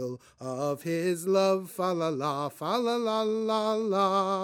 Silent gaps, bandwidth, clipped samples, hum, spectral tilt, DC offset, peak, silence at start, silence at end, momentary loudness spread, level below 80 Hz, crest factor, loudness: none; 18 kHz; under 0.1%; none; -5.5 dB/octave; under 0.1%; -12 dBFS; 0 s; 0 s; 7 LU; -78 dBFS; 16 dB; -28 LUFS